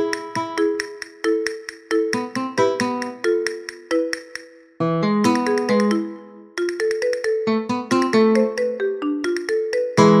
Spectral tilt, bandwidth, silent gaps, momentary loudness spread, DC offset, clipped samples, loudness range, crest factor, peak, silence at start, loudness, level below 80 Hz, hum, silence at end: -5.5 dB/octave; 13.5 kHz; none; 10 LU; under 0.1%; under 0.1%; 3 LU; 20 dB; 0 dBFS; 0 s; -21 LUFS; -66 dBFS; none; 0 s